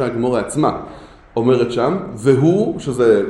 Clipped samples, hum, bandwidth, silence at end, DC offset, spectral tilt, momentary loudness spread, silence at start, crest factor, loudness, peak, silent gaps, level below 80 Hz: under 0.1%; none; 12 kHz; 0 s; under 0.1%; -7 dB/octave; 8 LU; 0 s; 16 dB; -17 LUFS; 0 dBFS; none; -46 dBFS